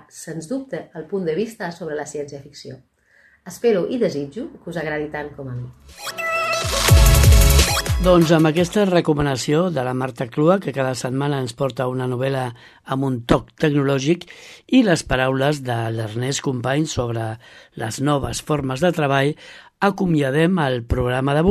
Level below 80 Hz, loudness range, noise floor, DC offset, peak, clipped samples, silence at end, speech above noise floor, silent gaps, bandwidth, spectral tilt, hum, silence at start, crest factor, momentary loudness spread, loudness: -28 dBFS; 10 LU; -55 dBFS; under 0.1%; -2 dBFS; under 0.1%; 0 s; 35 dB; none; 13.5 kHz; -5.5 dB/octave; none; 0.15 s; 18 dB; 16 LU; -20 LUFS